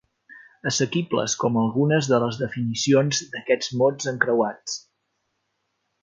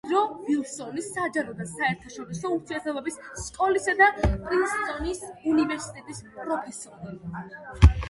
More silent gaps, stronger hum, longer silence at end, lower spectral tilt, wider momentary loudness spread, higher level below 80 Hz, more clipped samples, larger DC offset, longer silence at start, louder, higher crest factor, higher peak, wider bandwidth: neither; neither; first, 1.25 s vs 0 s; second, -4.5 dB/octave vs -6 dB/octave; second, 7 LU vs 18 LU; second, -64 dBFS vs -32 dBFS; neither; neither; first, 0.3 s vs 0.05 s; first, -23 LUFS vs -26 LUFS; about the same, 22 dB vs 24 dB; about the same, -2 dBFS vs -2 dBFS; second, 9.4 kHz vs 11.5 kHz